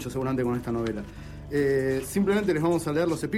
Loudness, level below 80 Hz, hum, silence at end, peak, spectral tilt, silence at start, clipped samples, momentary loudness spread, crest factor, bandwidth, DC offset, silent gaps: -26 LUFS; -46 dBFS; none; 0 s; -14 dBFS; -6.5 dB/octave; 0 s; under 0.1%; 8 LU; 12 dB; 16 kHz; under 0.1%; none